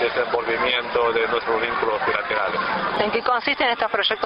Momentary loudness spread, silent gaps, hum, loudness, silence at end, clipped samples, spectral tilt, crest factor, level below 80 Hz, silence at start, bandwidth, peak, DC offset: 2 LU; none; none; -21 LUFS; 0 s; under 0.1%; -6 dB/octave; 16 dB; -54 dBFS; 0 s; 5.8 kHz; -6 dBFS; under 0.1%